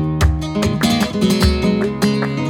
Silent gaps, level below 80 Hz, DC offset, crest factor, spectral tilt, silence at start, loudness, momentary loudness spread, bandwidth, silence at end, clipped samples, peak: none; -24 dBFS; under 0.1%; 14 dB; -5.5 dB/octave; 0 s; -17 LUFS; 3 LU; 17.5 kHz; 0 s; under 0.1%; -2 dBFS